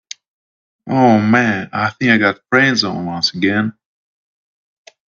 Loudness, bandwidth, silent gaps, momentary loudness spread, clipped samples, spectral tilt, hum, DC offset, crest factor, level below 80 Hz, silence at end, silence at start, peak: -15 LUFS; 7.4 kHz; none; 9 LU; under 0.1%; -5 dB/octave; none; under 0.1%; 16 dB; -58 dBFS; 1.35 s; 0.85 s; 0 dBFS